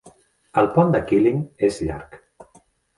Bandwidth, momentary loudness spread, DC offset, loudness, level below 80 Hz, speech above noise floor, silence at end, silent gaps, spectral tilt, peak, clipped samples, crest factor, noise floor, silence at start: 11.5 kHz; 11 LU; under 0.1%; -20 LUFS; -46 dBFS; 37 dB; 0.55 s; none; -8 dB/octave; -4 dBFS; under 0.1%; 18 dB; -57 dBFS; 0.05 s